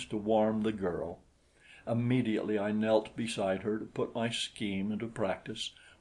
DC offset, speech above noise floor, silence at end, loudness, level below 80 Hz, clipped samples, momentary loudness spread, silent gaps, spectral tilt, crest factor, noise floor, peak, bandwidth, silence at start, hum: under 0.1%; 28 dB; 0.1 s; -33 LUFS; -64 dBFS; under 0.1%; 10 LU; none; -5.5 dB/octave; 20 dB; -61 dBFS; -14 dBFS; 11.5 kHz; 0 s; none